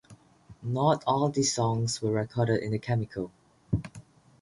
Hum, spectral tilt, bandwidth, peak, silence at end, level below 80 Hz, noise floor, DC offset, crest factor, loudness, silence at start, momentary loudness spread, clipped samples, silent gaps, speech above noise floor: none; -5.5 dB/octave; 11.5 kHz; -12 dBFS; 0.4 s; -52 dBFS; -54 dBFS; under 0.1%; 18 dB; -28 LUFS; 0.1 s; 12 LU; under 0.1%; none; 27 dB